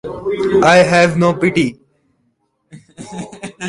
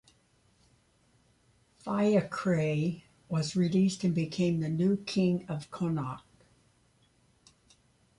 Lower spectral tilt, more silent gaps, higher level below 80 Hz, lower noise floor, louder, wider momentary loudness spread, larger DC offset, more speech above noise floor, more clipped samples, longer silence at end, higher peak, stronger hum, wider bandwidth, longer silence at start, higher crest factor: second, -5.5 dB/octave vs -7 dB/octave; neither; first, -48 dBFS vs -66 dBFS; about the same, -64 dBFS vs -67 dBFS; first, -13 LUFS vs -30 LUFS; first, 20 LU vs 10 LU; neither; first, 52 dB vs 39 dB; neither; second, 0 s vs 2 s; first, 0 dBFS vs -14 dBFS; neither; about the same, 11.5 kHz vs 11.5 kHz; second, 0.05 s vs 1.85 s; about the same, 16 dB vs 18 dB